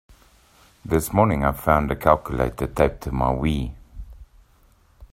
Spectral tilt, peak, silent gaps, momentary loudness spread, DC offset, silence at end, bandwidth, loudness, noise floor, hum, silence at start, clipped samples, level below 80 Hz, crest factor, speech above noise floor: -7 dB/octave; 0 dBFS; none; 20 LU; under 0.1%; 0.05 s; 16 kHz; -22 LUFS; -57 dBFS; none; 0.85 s; under 0.1%; -34 dBFS; 22 dB; 36 dB